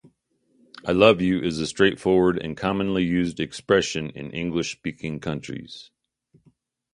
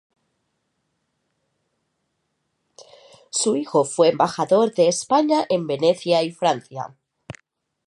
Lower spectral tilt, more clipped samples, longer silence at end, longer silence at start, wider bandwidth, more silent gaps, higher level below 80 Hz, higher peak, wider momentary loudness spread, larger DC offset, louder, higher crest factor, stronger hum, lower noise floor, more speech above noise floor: first, -5.5 dB/octave vs -4 dB/octave; neither; first, 1.1 s vs 0.55 s; second, 0.85 s vs 2.8 s; about the same, 11.5 kHz vs 11.5 kHz; neither; first, -50 dBFS vs -70 dBFS; first, 0 dBFS vs -4 dBFS; first, 15 LU vs 10 LU; neither; second, -23 LUFS vs -20 LUFS; about the same, 24 dB vs 20 dB; neither; second, -68 dBFS vs -74 dBFS; second, 45 dB vs 54 dB